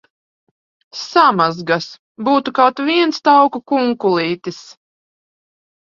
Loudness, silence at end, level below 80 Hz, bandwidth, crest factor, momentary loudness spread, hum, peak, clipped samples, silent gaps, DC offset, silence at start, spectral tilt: -15 LUFS; 1.25 s; -64 dBFS; 7.4 kHz; 18 dB; 17 LU; none; 0 dBFS; under 0.1%; 1.99-2.15 s; under 0.1%; 0.95 s; -5 dB/octave